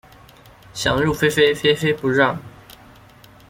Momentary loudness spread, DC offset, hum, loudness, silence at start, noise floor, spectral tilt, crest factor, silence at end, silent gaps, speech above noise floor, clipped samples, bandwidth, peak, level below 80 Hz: 9 LU; under 0.1%; none; -18 LUFS; 0.75 s; -47 dBFS; -4.5 dB/octave; 18 dB; 1 s; none; 29 dB; under 0.1%; 16.5 kHz; -2 dBFS; -46 dBFS